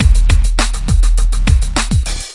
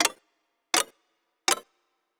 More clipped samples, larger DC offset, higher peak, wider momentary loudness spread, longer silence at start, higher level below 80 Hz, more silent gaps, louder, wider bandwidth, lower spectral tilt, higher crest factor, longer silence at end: neither; neither; first, 0 dBFS vs -6 dBFS; about the same, 4 LU vs 4 LU; about the same, 0 s vs 0 s; first, -12 dBFS vs -72 dBFS; neither; first, -15 LUFS vs -27 LUFS; second, 11.5 kHz vs over 20 kHz; first, -4.5 dB/octave vs 1.5 dB/octave; second, 10 dB vs 26 dB; second, 0 s vs 0.6 s